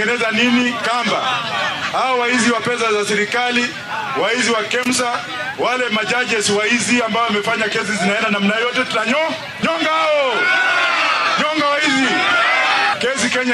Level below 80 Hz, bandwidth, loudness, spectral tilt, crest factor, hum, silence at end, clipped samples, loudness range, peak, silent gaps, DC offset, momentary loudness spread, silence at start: -60 dBFS; 14.5 kHz; -16 LUFS; -2.5 dB/octave; 14 dB; none; 0 s; under 0.1%; 3 LU; -4 dBFS; none; under 0.1%; 5 LU; 0 s